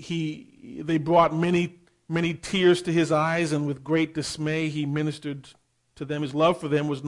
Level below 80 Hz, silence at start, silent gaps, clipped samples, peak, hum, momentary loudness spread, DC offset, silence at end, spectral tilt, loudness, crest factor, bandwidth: -58 dBFS; 0 s; none; under 0.1%; -6 dBFS; none; 14 LU; under 0.1%; 0 s; -6 dB/octave; -25 LUFS; 18 dB; 11.5 kHz